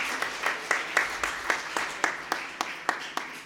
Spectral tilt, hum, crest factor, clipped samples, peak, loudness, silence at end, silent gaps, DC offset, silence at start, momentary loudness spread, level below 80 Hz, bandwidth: -0.5 dB/octave; none; 24 dB; under 0.1%; -8 dBFS; -29 LUFS; 0 s; none; under 0.1%; 0 s; 7 LU; -62 dBFS; 17.5 kHz